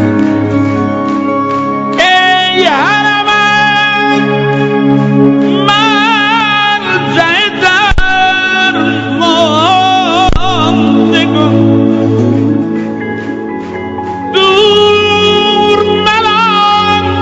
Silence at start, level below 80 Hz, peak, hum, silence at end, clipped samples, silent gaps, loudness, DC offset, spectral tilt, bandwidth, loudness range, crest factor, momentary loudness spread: 0 s; -28 dBFS; 0 dBFS; none; 0 s; 0.5%; none; -8 LUFS; under 0.1%; -5 dB/octave; 8 kHz; 2 LU; 8 dB; 6 LU